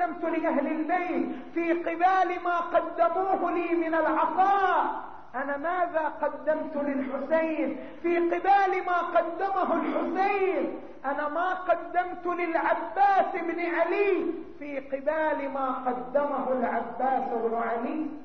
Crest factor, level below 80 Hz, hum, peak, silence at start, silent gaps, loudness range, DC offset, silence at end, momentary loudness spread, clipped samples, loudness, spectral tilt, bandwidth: 14 dB; -64 dBFS; none; -12 dBFS; 0 s; none; 3 LU; 0.5%; 0 s; 8 LU; under 0.1%; -27 LUFS; -2.5 dB/octave; 6.4 kHz